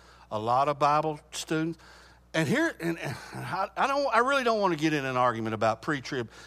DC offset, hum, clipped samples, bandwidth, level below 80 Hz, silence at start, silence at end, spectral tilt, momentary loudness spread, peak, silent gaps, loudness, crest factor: under 0.1%; none; under 0.1%; 15.5 kHz; -60 dBFS; 0.2 s; 0 s; -5 dB/octave; 11 LU; -8 dBFS; none; -28 LUFS; 20 dB